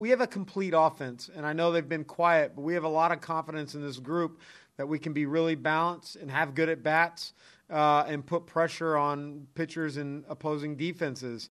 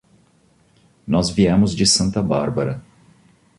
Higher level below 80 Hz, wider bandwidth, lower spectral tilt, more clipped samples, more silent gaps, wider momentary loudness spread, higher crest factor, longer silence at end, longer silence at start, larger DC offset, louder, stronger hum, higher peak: second, -78 dBFS vs -42 dBFS; first, 13 kHz vs 11.5 kHz; first, -6 dB/octave vs -4.5 dB/octave; neither; neither; about the same, 12 LU vs 11 LU; about the same, 20 dB vs 18 dB; second, 0.05 s vs 0.75 s; second, 0 s vs 1.05 s; neither; second, -29 LUFS vs -18 LUFS; neither; second, -10 dBFS vs -4 dBFS